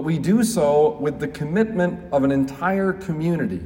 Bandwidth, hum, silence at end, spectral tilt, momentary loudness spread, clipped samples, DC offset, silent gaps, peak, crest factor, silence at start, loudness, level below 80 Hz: 16.5 kHz; none; 0 s; -6.5 dB/octave; 7 LU; under 0.1%; under 0.1%; none; -8 dBFS; 14 dB; 0 s; -21 LUFS; -50 dBFS